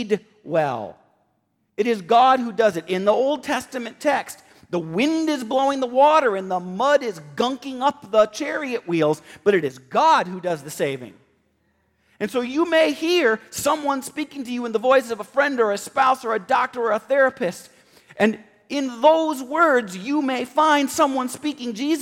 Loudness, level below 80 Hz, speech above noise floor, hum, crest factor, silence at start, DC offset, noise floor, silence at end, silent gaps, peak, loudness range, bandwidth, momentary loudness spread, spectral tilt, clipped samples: -21 LUFS; -66 dBFS; 48 dB; none; 18 dB; 0 s; under 0.1%; -69 dBFS; 0 s; none; -4 dBFS; 3 LU; 16.5 kHz; 10 LU; -4 dB/octave; under 0.1%